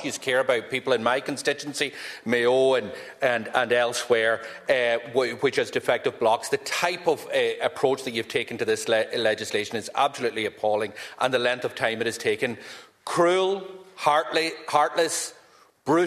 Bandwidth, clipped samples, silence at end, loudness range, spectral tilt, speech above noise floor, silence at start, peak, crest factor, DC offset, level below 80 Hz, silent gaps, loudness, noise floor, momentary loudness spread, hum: 14 kHz; under 0.1%; 0 s; 2 LU; -3 dB/octave; 31 dB; 0 s; -4 dBFS; 20 dB; under 0.1%; -70 dBFS; none; -25 LUFS; -56 dBFS; 7 LU; none